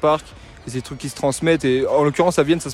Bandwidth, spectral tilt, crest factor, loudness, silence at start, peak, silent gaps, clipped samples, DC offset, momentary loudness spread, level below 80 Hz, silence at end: 14 kHz; -5.5 dB/octave; 16 dB; -19 LUFS; 0 s; -4 dBFS; none; under 0.1%; under 0.1%; 13 LU; -46 dBFS; 0 s